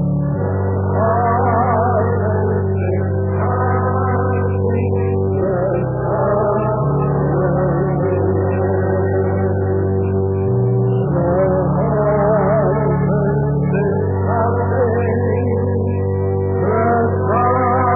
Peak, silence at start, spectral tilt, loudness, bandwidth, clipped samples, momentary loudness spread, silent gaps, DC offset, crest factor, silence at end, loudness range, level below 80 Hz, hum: -4 dBFS; 0 s; -14.5 dB/octave; -17 LUFS; 2.8 kHz; under 0.1%; 3 LU; none; 0.2%; 12 dB; 0 s; 2 LU; -38 dBFS; none